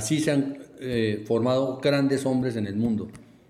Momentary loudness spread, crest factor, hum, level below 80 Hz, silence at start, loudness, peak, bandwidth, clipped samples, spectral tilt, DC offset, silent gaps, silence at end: 8 LU; 16 dB; none; -58 dBFS; 0 s; -25 LUFS; -10 dBFS; 14.5 kHz; under 0.1%; -6 dB/octave; under 0.1%; none; 0.3 s